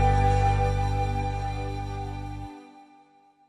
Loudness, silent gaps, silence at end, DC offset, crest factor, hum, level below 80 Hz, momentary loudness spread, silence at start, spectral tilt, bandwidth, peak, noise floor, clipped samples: -27 LUFS; none; 0.65 s; under 0.1%; 16 dB; none; -32 dBFS; 16 LU; 0 s; -7 dB/octave; 10 kHz; -10 dBFS; -58 dBFS; under 0.1%